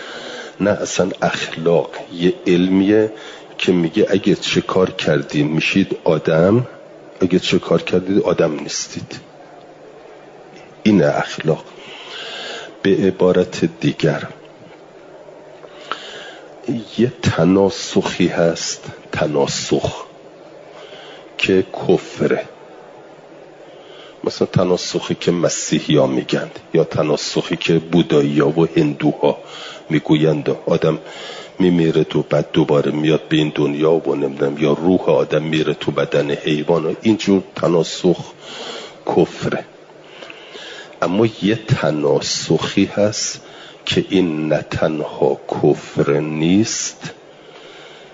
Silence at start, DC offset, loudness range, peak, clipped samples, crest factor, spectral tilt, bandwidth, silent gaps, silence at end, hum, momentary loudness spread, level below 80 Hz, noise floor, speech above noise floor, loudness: 0 s; under 0.1%; 5 LU; -2 dBFS; under 0.1%; 16 dB; -5.5 dB/octave; 7.8 kHz; none; 0.05 s; none; 16 LU; -54 dBFS; -41 dBFS; 24 dB; -17 LUFS